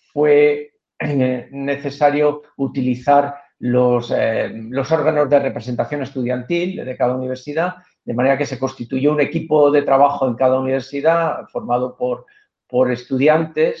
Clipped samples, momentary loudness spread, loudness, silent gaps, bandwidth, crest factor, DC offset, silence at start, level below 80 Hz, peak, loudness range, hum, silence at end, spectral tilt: under 0.1%; 10 LU; -18 LUFS; none; 7.2 kHz; 16 dB; under 0.1%; 0.15 s; -60 dBFS; -2 dBFS; 4 LU; none; 0 s; -7.5 dB/octave